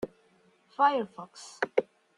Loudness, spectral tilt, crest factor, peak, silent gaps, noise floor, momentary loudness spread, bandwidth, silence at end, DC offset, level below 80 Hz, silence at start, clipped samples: -29 LUFS; -4 dB/octave; 24 dB; -8 dBFS; none; -65 dBFS; 19 LU; 11 kHz; 0.35 s; under 0.1%; -74 dBFS; 0 s; under 0.1%